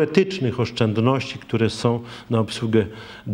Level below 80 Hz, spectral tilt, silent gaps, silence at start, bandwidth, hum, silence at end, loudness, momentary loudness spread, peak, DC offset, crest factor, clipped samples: -54 dBFS; -6.5 dB/octave; none; 0 s; 11 kHz; none; 0 s; -22 LUFS; 7 LU; -2 dBFS; under 0.1%; 20 dB; under 0.1%